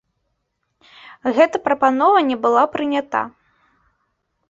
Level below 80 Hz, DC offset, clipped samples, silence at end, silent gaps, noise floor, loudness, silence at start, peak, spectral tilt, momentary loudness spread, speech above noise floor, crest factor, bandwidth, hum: -64 dBFS; under 0.1%; under 0.1%; 1.2 s; none; -72 dBFS; -17 LUFS; 1.25 s; -2 dBFS; -4.5 dB/octave; 9 LU; 56 dB; 18 dB; 7.8 kHz; none